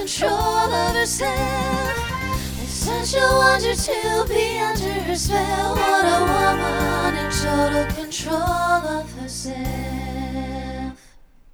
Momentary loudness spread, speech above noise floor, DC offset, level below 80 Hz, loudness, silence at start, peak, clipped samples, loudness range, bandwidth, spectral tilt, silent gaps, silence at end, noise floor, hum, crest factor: 11 LU; 27 dB; under 0.1%; -34 dBFS; -21 LUFS; 0 s; -4 dBFS; under 0.1%; 5 LU; over 20 kHz; -4 dB/octave; none; 0.6 s; -48 dBFS; none; 18 dB